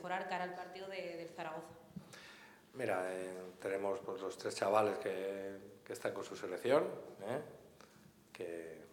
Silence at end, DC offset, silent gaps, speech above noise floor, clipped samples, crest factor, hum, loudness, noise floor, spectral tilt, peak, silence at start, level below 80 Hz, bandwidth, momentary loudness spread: 0 s; under 0.1%; none; 23 dB; under 0.1%; 24 dB; none; -41 LUFS; -63 dBFS; -4.5 dB/octave; -18 dBFS; 0 s; -82 dBFS; 19 kHz; 20 LU